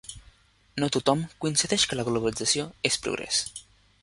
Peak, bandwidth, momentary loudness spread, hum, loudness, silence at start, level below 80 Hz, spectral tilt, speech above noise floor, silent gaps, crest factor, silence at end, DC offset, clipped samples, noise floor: -6 dBFS; 11.5 kHz; 12 LU; none; -26 LUFS; 0.05 s; -56 dBFS; -3 dB/octave; 31 dB; none; 22 dB; 0.4 s; under 0.1%; under 0.1%; -58 dBFS